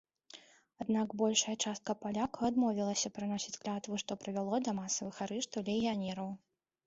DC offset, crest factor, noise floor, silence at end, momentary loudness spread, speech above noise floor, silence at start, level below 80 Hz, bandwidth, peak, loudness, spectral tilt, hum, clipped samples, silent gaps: under 0.1%; 20 dB; -59 dBFS; 0.5 s; 12 LU; 23 dB; 0.35 s; -72 dBFS; 8 kHz; -16 dBFS; -36 LUFS; -4 dB/octave; none; under 0.1%; none